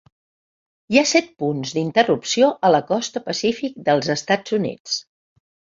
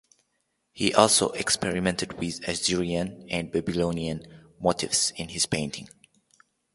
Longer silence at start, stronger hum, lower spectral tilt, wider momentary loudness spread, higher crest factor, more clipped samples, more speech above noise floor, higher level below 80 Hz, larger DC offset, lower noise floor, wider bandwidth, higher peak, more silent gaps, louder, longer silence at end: first, 0.9 s vs 0.75 s; neither; about the same, -4 dB/octave vs -3 dB/octave; about the same, 9 LU vs 11 LU; second, 20 dB vs 28 dB; neither; first, over 70 dB vs 49 dB; second, -64 dBFS vs -52 dBFS; neither; first, under -90 dBFS vs -76 dBFS; second, 7.8 kHz vs 12 kHz; about the same, -2 dBFS vs 0 dBFS; first, 4.80-4.85 s vs none; first, -20 LUFS vs -26 LUFS; second, 0.75 s vs 0.9 s